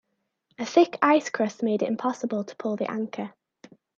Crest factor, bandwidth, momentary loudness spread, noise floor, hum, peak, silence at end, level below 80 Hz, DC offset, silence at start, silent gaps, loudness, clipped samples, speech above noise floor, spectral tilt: 22 dB; 7.4 kHz; 13 LU; -72 dBFS; none; -6 dBFS; 0.7 s; -80 dBFS; under 0.1%; 0.6 s; none; -25 LUFS; under 0.1%; 48 dB; -5 dB/octave